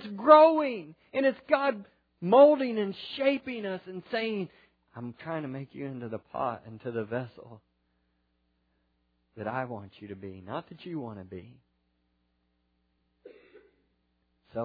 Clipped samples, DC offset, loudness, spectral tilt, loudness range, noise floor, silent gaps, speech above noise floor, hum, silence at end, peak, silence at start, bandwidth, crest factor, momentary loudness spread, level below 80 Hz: under 0.1%; under 0.1%; -27 LUFS; -9 dB/octave; 17 LU; -75 dBFS; none; 47 dB; none; 0 s; -4 dBFS; 0 s; 5 kHz; 26 dB; 23 LU; -74 dBFS